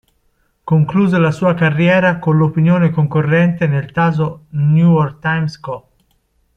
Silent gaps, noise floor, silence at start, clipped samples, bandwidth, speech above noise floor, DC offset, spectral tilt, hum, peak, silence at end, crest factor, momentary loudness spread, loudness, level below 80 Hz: none; -61 dBFS; 0.65 s; under 0.1%; 6.6 kHz; 47 dB; under 0.1%; -9 dB/octave; none; -2 dBFS; 0.8 s; 12 dB; 8 LU; -14 LUFS; -50 dBFS